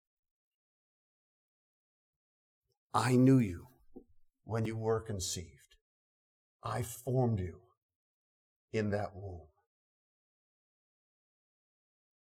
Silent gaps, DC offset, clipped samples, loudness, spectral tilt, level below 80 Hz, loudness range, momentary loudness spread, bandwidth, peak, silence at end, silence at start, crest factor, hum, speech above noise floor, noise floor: 5.81-6.59 s, 7.77-7.89 s, 7.96-8.68 s; under 0.1%; under 0.1%; -33 LUFS; -6.5 dB/octave; -64 dBFS; 10 LU; 19 LU; 16 kHz; -16 dBFS; 2.85 s; 2.95 s; 22 dB; none; 29 dB; -61 dBFS